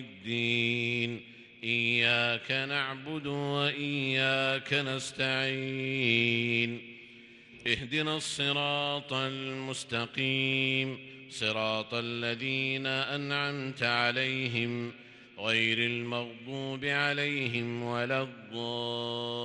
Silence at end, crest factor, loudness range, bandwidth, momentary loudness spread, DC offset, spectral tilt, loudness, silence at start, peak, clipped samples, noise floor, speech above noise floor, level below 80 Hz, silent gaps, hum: 0 s; 20 dB; 3 LU; 11.5 kHz; 10 LU; under 0.1%; -4.5 dB/octave; -30 LUFS; 0 s; -12 dBFS; under 0.1%; -53 dBFS; 21 dB; -70 dBFS; none; none